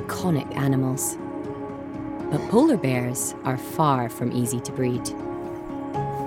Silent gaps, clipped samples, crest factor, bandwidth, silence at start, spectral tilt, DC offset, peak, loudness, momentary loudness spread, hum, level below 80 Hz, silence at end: none; under 0.1%; 18 dB; 17 kHz; 0 s; -6 dB/octave; under 0.1%; -6 dBFS; -25 LUFS; 13 LU; none; -54 dBFS; 0 s